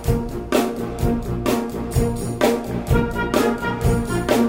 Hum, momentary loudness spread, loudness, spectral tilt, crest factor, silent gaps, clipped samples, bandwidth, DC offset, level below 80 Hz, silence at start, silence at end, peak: none; 4 LU; -21 LUFS; -6 dB/octave; 16 dB; none; under 0.1%; 16.5 kHz; under 0.1%; -30 dBFS; 0 s; 0 s; -4 dBFS